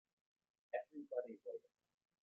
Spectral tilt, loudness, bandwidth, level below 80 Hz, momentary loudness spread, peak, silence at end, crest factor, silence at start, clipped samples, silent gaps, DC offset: -4 dB/octave; -49 LUFS; 4.1 kHz; under -90 dBFS; 7 LU; -30 dBFS; 0.65 s; 22 dB; 0.75 s; under 0.1%; none; under 0.1%